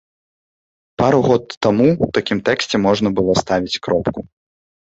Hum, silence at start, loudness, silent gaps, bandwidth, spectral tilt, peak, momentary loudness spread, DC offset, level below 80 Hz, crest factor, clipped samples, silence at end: none; 1 s; -17 LUFS; 1.57-1.61 s; 8.2 kHz; -5.5 dB/octave; 0 dBFS; 5 LU; under 0.1%; -46 dBFS; 18 dB; under 0.1%; 0.65 s